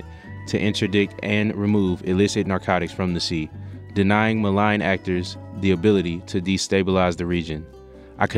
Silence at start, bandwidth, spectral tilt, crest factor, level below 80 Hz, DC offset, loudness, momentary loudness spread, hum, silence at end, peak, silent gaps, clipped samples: 0 s; 11 kHz; -6 dB/octave; 20 dB; -48 dBFS; under 0.1%; -22 LUFS; 11 LU; none; 0 s; -2 dBFS; none; under 0.1%